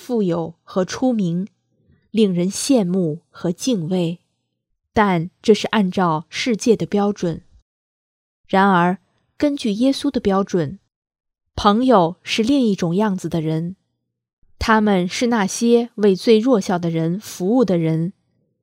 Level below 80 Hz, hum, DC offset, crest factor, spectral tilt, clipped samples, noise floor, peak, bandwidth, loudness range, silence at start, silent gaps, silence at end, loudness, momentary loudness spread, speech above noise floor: -48 dBFS; none; under 0.1%; 20 dB; -5.5 dB/octave; under 0.1%; -75 dBFS; 0 dBFS; 15.5 kHz; 3 LU; 0 s; 7.62-8.44 s, 10.96-11.02 s, 14.33-14.42 s; 0.5 s; -19 LUFS; 10 LU; 57 dB